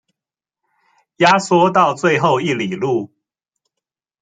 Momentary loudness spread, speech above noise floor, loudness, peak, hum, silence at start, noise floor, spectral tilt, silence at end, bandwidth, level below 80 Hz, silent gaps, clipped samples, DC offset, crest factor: 8 LU; 73 dB; -15 LUFS; -2 dBFS; none; 1.2 s; -88 dBFS; -5 dB/octave; 1.15 s; 9.4 kHz; -62 dBFS; none; under 0.1%; under 0.1%; 18 dB